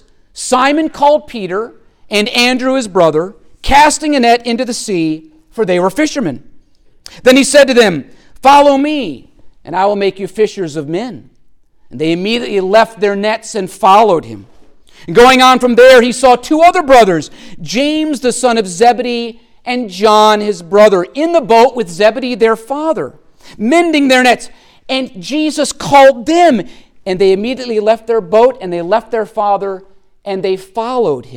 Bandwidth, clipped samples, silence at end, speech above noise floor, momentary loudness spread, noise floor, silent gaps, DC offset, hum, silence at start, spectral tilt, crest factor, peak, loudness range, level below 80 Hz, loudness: 17.5 kHz; under 0.1%; 0 s; 34 dB; 14 LU; -44 dBFS; none; under 0.1%; none; 0.35 s; -4 dB/octave; 12 dB; 0 dBFS; 7 LU; -40 dBFS; -11 LUFS